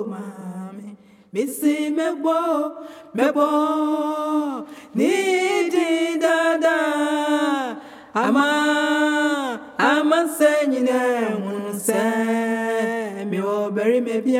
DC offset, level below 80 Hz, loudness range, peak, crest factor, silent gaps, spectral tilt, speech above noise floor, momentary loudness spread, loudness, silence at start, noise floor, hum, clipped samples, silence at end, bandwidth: under 0.1%; -78 dBFS; 3 LU; -4 dBFS; 18 dB; none; -4 dB/octave; 22 dB; 12 LU; -21 LUFS; 0 s; -42 dBFS; none; under 0.1%; 0 s; 16 kHz